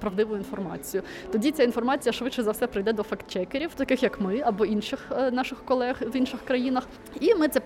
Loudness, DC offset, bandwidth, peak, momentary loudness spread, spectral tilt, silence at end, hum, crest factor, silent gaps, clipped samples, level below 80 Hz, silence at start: -27 LUFS; under 0.1%; 16.5 kHz; -10 dBFS; 8 LU; -5 dB/octave; 0 s; none; 18 dB; none; under 0.1%; -54 dBFS; 0 s